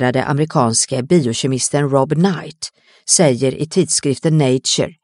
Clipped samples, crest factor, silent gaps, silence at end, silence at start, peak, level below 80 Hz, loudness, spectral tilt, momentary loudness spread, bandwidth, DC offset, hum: under 0.1%; 16 dB; none; 0.1 s; 0 s; 0 dBFS; -56 dBFS; -15 LUFS; -4.5 dB/octave; 8 LU; 11.5 kHz; under 0.1%; none